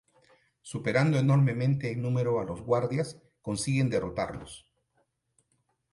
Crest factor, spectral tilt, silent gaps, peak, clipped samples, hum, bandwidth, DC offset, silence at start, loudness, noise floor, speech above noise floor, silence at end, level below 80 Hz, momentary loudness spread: 18 dB; -6.5 dB/octave; none; -12 dBFS; under 0.1%; none; 11.5 kHz; under 0.1%; 0.65 s; -28 LUFS; -75 dBFS; 47 dB; 1.35 s; -58 dBFS; 16 LU